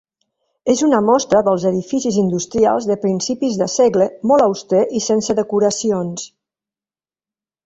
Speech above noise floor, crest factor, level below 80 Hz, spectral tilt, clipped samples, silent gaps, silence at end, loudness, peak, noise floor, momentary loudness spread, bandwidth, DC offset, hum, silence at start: over 74 dB; 16 dB; -54 dBFS; -5 dB/octave; under 0.1%; none; 1.4 s; -16 LUFS; -2 dBFS; under -90 dBFS; 6 LU; 8.2 kHz; under 0.1%; none; 0.65 s